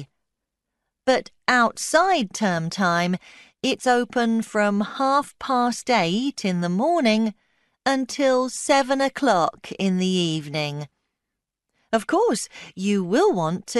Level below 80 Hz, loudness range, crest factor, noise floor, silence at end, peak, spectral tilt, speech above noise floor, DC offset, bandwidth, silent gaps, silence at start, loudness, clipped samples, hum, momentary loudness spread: -64 dBFS; 3 LU; 20 dB; -84 dBFS; 0 s; -4 dBFS; -4.5 dB/octave; 62 dB; under 0.1%; 12 kHz; none; 0 s; -22 LUFS; under 0.1%; none; 8 LU